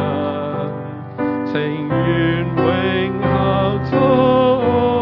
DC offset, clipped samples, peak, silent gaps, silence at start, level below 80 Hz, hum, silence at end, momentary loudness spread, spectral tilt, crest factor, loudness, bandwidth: under 0.1%; under 0.1%; -2 dBFS; none; 0 s; -42 dBFS; none; 0 s; 10 LU; -10 dB/octave; 16 dB; -17 LUFS; 5.8 kHz